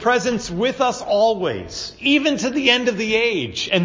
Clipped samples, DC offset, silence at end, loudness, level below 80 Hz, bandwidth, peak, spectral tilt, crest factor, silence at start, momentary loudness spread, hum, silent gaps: under 0.1%; under 0.1%; 0 s; -19 LUFS; -50 dBFS; 7.6 kHz; 0 dBFS; -4 dB/octave; 18 dB; 0 s; 7 LU; none; none